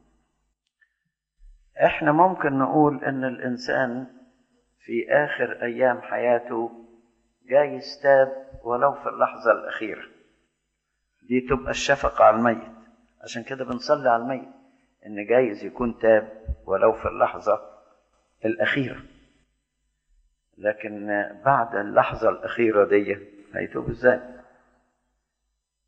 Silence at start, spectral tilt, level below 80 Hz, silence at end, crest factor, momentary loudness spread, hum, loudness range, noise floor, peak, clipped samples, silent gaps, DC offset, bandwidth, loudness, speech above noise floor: 1.75 s; -6 dB/octave; -50 dBFS; 1.45 s; 22 dB; 13 LU; none; 4 LU; -79 dBFS; -4 dBFS; under 0.1%; none; under 0.1%; 8 kHz; -23 LUFS; 56 dB